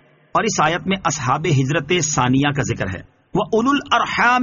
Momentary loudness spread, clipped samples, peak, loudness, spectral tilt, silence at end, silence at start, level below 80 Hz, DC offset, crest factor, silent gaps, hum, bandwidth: 7 LU; under 0.1%; -2 dBFS; -18 LUFS; -4 dB/octave; 0 s; 0.35 s; -46 dBFS; under 0.1%; 16 dB; none; none; 7.4 kHz